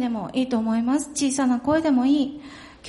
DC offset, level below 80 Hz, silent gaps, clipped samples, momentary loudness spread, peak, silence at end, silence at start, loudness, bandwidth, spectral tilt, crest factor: under 0.1%; -56 dBFS; none; under 0.1%; 8 LU; -8 dBFS; 0 s; 0 s; -22 LUFS; 11.5 kHz; -4 dB/octave; 14 dB